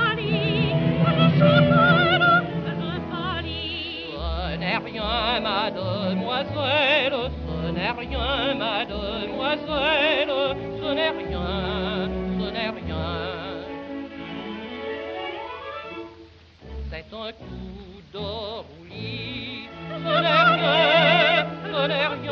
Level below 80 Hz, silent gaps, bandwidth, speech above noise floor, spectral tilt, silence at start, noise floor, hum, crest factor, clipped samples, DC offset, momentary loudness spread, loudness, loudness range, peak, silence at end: -42 dBFS; none; 6.4 kHz; 24 dB; -3.5 dB/octave; 0 s; -48 dBFS; none; 18 dB; under 0.1%; under 0.1%; 18 LU; -22 LUFS; 14 LU; -4 dBFS; 0 s